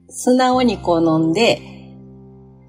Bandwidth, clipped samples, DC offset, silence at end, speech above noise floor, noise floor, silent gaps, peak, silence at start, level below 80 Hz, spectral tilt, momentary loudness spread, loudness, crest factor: 15.5 kHz; under 0.1%; under 0.1%; 0.7 s; 27 dB; -43 dBFS; none; -4 dBFS; 0.1 s; -46 dBFS; -5 dB/octave; 3 LU; -16 LUFS; 14 dB